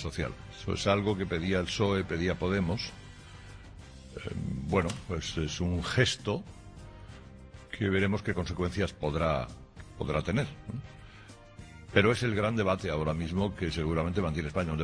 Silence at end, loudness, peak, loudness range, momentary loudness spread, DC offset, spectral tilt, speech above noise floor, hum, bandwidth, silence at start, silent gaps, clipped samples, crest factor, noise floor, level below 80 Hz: 0 s; -31 LUFS; -10 dBFS; 4 LU; 22 LU; under 0.1%; -5.5 dB/octave; 21 dB; none; 10.5 kHz; 0 s; none; under 0.1%; 22 dB; -51 dBFS; -46 dBFS